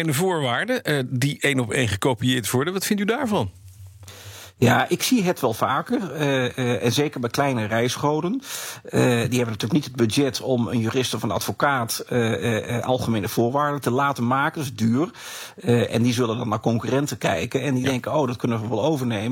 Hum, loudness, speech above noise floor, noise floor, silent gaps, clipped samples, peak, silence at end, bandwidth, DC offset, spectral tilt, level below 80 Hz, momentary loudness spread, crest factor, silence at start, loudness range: none; -22 LUFS; 21 dB; -43 dBFS; none; under 0.1%; -6 dBFS; 0 s; 17 kHz; under 0.1%; -5 dB/octave; -62 dBFS; 5 LU; 16 dB; 0 s; 1 LU